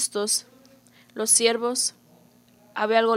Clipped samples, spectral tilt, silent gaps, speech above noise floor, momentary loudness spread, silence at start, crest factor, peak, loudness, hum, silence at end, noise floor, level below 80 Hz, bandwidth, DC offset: under 0.1%; -0.5 dB/octave; none; 34 dB; 13 LU; 0 s; 20 dB; -6 dBFS; -22 LUFS; 60 Hz at -55 dBFS; 0 s; -56 dBFS; -82 dBFS; 16 kHz; under 0.1%